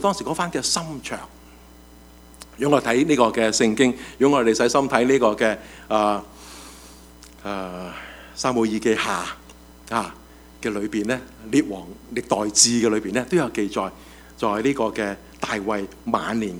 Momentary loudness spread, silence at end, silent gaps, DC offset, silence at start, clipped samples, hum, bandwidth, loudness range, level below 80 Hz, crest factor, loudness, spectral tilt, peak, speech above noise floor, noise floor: 16 LU; 0 s; none; under 0.1%; 0 s; under 0.1%; none; over 20 kHz; 7 LU; -50 dBFS; 22 dB; -22 LUFS; -3.5 dB/octave; 0 dBFS; 25 dB; -47 dBFS